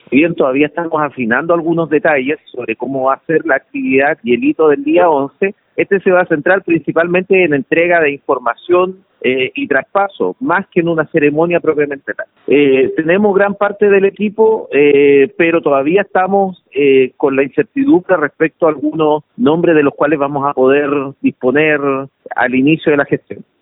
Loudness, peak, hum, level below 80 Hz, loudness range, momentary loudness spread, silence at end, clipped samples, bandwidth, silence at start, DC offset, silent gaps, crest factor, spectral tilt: -13 LUFS; 0 dBFS; none; -58 dBFS; 3 LU; 7 LU; 0.25 s; under 0.1%; 4 kHz; 0.1 s; under 0.1%; none; 12 dB; -11.5 dB/octave